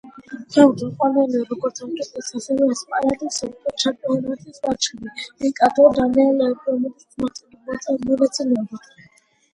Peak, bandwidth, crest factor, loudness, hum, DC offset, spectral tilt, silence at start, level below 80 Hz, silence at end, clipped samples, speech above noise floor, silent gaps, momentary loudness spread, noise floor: 0 dBFS; 11 kHz; 20 dB; -20 LUFS; none; under 0.1%; -4 dB/octave; 0.05 s; -56 dBFS; 0.75 s; under 0.1%; 36 dB; none; 15 LU; -55 dBFS